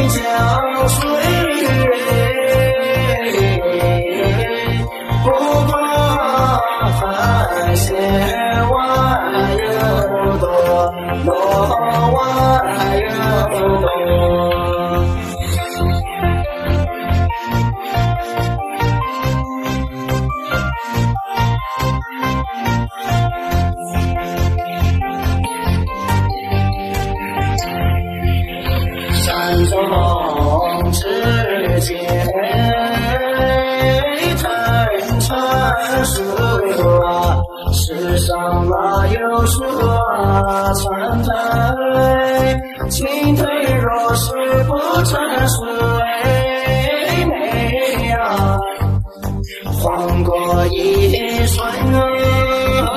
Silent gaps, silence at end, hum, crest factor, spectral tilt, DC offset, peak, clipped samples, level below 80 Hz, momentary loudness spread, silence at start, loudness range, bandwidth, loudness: none; 0 s; none; 12 dB; -5.5 dB/octave; under 0.1%; -2 dBFS; under 0.1%; -26 dBFS; 5 LU; 0 s; 4 LU; 14.5 kHz; -16 LUFS